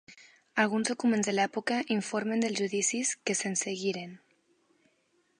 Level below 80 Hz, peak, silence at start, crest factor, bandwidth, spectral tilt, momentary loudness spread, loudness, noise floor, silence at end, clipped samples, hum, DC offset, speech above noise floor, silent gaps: -82 dBFS; -10 dBFS; 0.1 s; 22 dB; 11.5 kHz; -3 dB/octave; 6 LU; -30 LUFS; -72 dBFS; 1.2 s; under 0.1%; none; under 0.1%; 42 dB; none